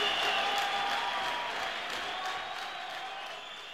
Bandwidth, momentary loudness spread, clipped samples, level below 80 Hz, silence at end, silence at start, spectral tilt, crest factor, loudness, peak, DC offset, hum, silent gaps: 16 kHz; 11 LU; under 0.1%; -68 dBFS; 0 s; 0 s; -0.5 dB/octave; 16 dB; -33 LUFS; -18 dBFS; under 0.1%; none; none